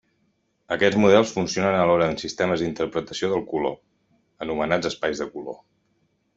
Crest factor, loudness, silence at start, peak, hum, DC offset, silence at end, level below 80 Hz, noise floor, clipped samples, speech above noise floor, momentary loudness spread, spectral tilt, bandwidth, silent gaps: 22 dB; -23 LUFS; 0.7 s; -2 dBFS; none; under 0.1%; 0.8 s; -56 dBFS; -69 dBFS; under 0.1%; 47 dB; 15 LU; -5 dB/octave; 8 kHz; none